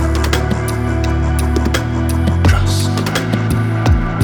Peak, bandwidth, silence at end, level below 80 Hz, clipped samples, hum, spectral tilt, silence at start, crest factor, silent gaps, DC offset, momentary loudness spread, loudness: 0 dBFS; 19 kHz; 0 s; -20 dBFS; under 0.1%; none; -6 dB/octave; 0 s; 14 dB; none; under 0.1%; 4 LU; -16 LUFS